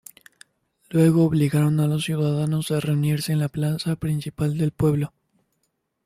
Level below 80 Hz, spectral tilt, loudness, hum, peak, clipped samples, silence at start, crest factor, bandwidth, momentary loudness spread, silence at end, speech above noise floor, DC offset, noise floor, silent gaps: -52 dBFS; -7 dB/octave; -22 LUFS; none; -6 dBFS; under 0.1%; 0.9 s; 16 dB; 15 kHz; 7 LU; 0.95 s; 53 dB; under 0.1%; -74 dBFS; none